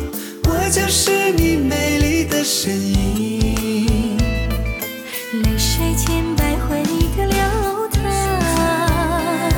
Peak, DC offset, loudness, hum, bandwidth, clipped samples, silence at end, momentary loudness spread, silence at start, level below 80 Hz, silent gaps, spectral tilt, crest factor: -4 dBFS; under 0.1%; -18 LUFS; none; 19 kHz; under 0.1%; 0 s; 6 LU; 0 s; -24 dBFS; none; -4.5 dB/octave; 14 dB